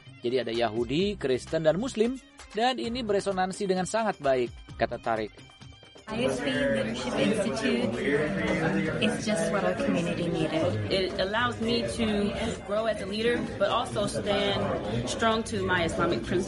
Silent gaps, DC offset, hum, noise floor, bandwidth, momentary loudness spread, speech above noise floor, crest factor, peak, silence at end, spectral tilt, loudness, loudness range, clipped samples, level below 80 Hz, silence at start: none; under 0.1%; none; -49 dBFS; 11.5 kHz; 4 LU; 22 dB; 18 dB; -10 dBFS; 0 s; -5 dB/octave; -28 LUFS; 2 LU; under 0.1%; -50 dBFS; 0.05 s